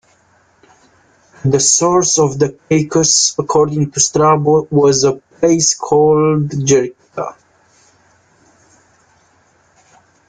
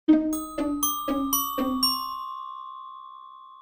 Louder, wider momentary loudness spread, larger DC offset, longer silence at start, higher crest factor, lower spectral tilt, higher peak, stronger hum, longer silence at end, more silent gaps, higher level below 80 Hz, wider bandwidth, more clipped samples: first, -13 LUFS vs -26 LUFS; second, 8 LU vs 20 LU; neither; first, 1.45 s vs 0.1 s; about the same, 14 dB vs 18 dB; first, -4 dB/octave vs -2 dB/octave; first, 0 dBFS vs -8 dBFS; neither; first, 2.95 s vs 0 s; neither; about the same, -50 dBFS vs -54 dBFS; second, 10 kHz vs 16.5 kHz; neither